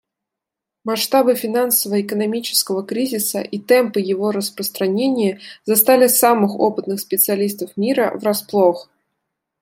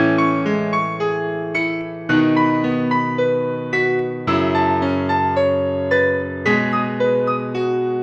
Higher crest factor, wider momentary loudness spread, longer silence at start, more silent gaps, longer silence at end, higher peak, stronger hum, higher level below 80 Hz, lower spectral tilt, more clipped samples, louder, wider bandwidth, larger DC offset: about the same, 18 dB vs 14 dB; first, 9 LU vs 5 LU; first, 0.85 s vs 0 s; neither; first, 0.8 s vs 0 s; first, 0 dBFS vs -4 dBFS; neither; second, -70 dBFS vs -56 dBFS; second, -3.5 dB/octave vs -7.5 dB/octave; neither; about the same, -17 LUFS vs -19 LUFS; first, 16.5 kHz vs 7.6 kHz; neither